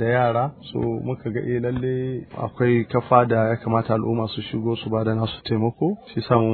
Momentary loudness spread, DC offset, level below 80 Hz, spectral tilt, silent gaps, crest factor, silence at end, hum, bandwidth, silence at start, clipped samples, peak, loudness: 9 LU; under 0.1%; -52 dBFS; -11 dB/octave; none; 20 dB; 0 s; none; 4.5 kHz; 0 s; under 0.1%; 0 dBFS; -23 LUFS